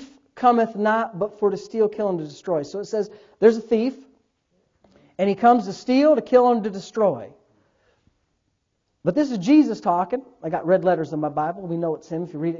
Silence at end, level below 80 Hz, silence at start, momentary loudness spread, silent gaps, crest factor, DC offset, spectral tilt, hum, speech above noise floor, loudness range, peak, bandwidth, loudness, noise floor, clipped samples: 0 s; -64 dBFS; 0 s; 11 LU; none; 20 dB; under 0.1%; -7 dB/octave; none; 52 dB; 3 LU; -2 dBFS; 7.6 kHz; -21 LUFS; -73 dBFS; under 0.1%